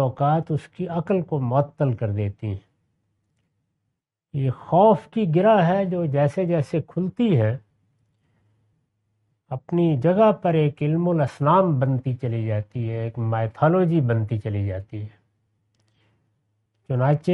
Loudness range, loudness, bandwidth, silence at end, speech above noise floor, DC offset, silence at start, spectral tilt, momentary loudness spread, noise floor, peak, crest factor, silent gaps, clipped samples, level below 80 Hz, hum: 7 LU; -22 LUFS; 6.4 kHz; 0 s; 58 dB; under 0.1%; 0 s; -9.5 dB/octave; 11 LU; -79 dBFS; -4 dBFS; 18 dB; none; under 0.1%; -60 dBFS; none